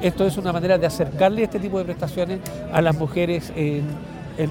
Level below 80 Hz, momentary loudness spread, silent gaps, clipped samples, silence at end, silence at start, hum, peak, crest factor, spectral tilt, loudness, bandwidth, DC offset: -44 dBFS; 8 LU; none; under 0.1%; 0 s; 0 s; none; -4 dBFS; 18 dB; -7 dB/octave; -22 LUFS; 17 kHz; under 0.1%